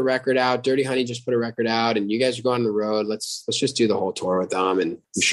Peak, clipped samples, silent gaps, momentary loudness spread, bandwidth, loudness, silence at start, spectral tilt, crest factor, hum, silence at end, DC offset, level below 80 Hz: -8 dBFS; under 0.1%; none; 4 LU; 12.5 kHz; -22 LUFS; 0 s; -4 dB/octave; 16 dB; none; 0 s; under 0.1%; -68 dBFS